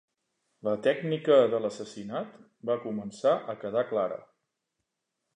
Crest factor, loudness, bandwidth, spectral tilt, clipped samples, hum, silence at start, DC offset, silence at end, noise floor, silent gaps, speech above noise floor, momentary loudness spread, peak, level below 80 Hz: 20 dB; -29 LUFS; 10 kHz; -6 dB/octave; under 0.1%; none; 0.65 s; under 0.1%; 1.15 s; -84 dBFS; none; 55 dB; 15 LU; -10 dBFS; -76 dBFS